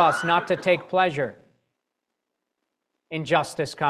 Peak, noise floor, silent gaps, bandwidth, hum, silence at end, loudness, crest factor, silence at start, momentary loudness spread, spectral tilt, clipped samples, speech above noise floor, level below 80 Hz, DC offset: -6 dBFS; -82 dBFS; none; 14 kHz; none; 0 s; -23 LUFS; 20 dB; 0 s; 11 LU; -5 dB/octave; under 0.1%; 59 dB; -66 dBFS; under 0.1%